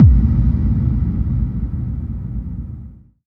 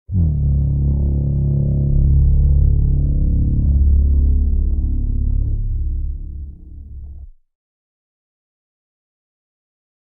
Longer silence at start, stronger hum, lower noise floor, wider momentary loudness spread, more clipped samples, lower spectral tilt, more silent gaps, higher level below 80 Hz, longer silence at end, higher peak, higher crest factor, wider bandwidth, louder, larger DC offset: about the same, 0 s vs 0.1 s; neither; about the same, -37 dBFS vs -36 dBFS; second, 14 LU vs 18 LU; neither; second, -12.5 dB/octave vs -17 dB/octave; neither; about the same, -20 dBFS vs -18 dBFS; second, 0.35 s vs 2.7 s; first, 0 dBFS vs -4 dBFS; about the same, 16 dB vs 14 dB; first, 2.4 kHz vs 0.9 kHz; about the same, -19 LUFS vs -18 LUFS; neither